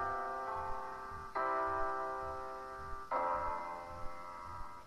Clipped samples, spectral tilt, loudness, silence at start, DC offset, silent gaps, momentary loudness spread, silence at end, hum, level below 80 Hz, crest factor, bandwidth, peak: under 0.1%; -5.5 dB/octave; -40 LUFS; 0 s; under 0.1%; none; 12 LU; 0 s; none; -54 dBFS; 16 dB; 13.5 kHz; -24 dBFS